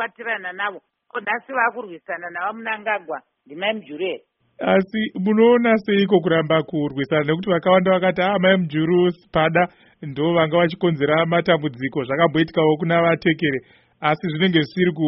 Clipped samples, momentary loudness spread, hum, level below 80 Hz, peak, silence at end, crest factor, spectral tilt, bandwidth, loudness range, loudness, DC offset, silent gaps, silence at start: under 0.1%; 11 LU; none; -58 dBFS; -2 dBFS; 0 s; 18 dB; -4.5 dB/octave; 5.8 kHz; 7 LU; -20 LUFS; under 0.1%; none; 0 s